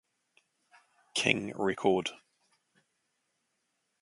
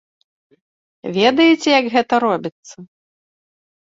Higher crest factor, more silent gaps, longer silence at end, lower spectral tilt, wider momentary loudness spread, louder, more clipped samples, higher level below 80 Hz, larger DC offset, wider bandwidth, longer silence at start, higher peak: first, 28 dB vs 18 dB; second, none vs 2.52-2.63 s; first, 1.85 s vs 1.15 s; about the same, -3.5 dB/octave vs -4.5 dB/octave; second, 7 LU vs 14 LU; second, -30 LUFS vs -15 LUFS; neither; second, -72 dBFS vs -66 dBFS; neither; first, 11.5 kHz vs 7.8 kHz; about the same, 1.15 s vs 1.05 s; second, -8 dBFS vs 0 dBFS